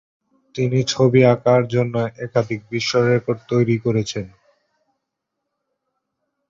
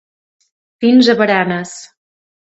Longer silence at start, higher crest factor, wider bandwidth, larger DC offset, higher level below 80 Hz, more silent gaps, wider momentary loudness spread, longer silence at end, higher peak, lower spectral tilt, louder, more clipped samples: second, 0.55 s vs 0.8 s; about the same, 20 dB vs 16 dB; about the same, 7.6 kHz vs 8.2 kHz; neither; first, -56 dBFS vs -62 dBFS; neither; second, 11 LU vs 18 LU; first, 2.2 s vs 0.65 s; about the same, -2 dBFS vs 0 dBFS; about the same, -6 dB/octave vs -5 dB/octave; second, -19 LUFS vs -13 LUFS; neither